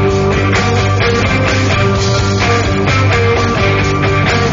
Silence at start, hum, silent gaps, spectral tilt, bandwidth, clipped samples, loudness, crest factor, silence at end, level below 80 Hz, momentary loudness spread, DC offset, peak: 0 s; none; none; -5.5 dB/octave; 7.6 kHz; under 0.1%; -12 LUFS; 10 dB; 0 s; -26 dBFS; 1 LU; under 0.1%; 0 dBFS